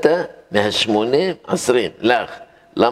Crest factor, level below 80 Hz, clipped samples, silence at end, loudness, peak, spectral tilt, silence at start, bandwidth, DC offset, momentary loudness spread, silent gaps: 18 dB; -58 dBFS; under 0.1%; 0 s; -18 LUFS; 0 dBFS; -4 dB/octave; 0 s; 15 kHz; under 0.1%; 10 LU; none